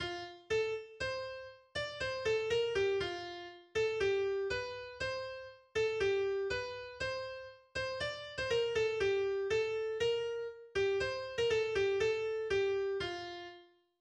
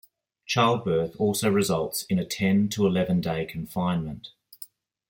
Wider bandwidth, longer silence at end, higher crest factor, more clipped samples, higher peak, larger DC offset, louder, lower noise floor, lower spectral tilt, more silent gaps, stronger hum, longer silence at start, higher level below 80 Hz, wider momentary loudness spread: second, 9.8 kHz vs 17 kHz; about the same, 0.4 s vs 0.45 s; about the same, 14 dB vs 18 dB; neither; second, -22 dBFS vs -8 dBFS; neither; second, -36 LUFS vs -25 LUFS; first, -59 dBFS vs -48 dBFS; second, -4 dB/octave vs -5.5 dB/octave; neither; neither; second, 0 s vs 0.5 s; second, -62 dBFS vs -56 dBFS; second, 11 LU vs 20 LU